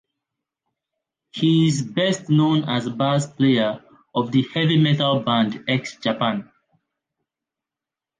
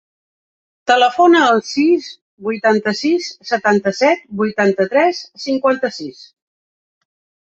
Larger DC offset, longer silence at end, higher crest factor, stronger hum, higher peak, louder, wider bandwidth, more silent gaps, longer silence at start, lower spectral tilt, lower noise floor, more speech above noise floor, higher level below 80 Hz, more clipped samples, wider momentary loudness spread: neither; first, 1.75 s vs 1.45 s; about the same, 14 dB vs 16 dB; neither; second, -6 dBFS vs -2 dBFS; second, -20 LUFS vs -15 LUFS; first, 9.6 kHz vs 8 kHz; second, none vs 2.21-2.38 s; first, 1.35 s vs 0.85 s; first, -6 dB/octave vs -4.5 dB/octave; about the same, -88 dBFS vs under -90 dBFS; second, 69 dB vs over 75 dB; about the same, -62 dBFS vs -64 dBFS; neither; second, 8 LU vs 14 LU